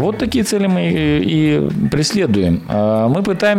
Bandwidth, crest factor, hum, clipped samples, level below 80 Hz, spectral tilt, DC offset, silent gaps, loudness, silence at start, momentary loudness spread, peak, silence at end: 15.5 kHz; 10 dB; none; under 0.1%; -38 dBFS; -6 dB/octave; under 0.1%; none; -15 LUFS; 0 s; 2 LU; -6 dBFS; 0 s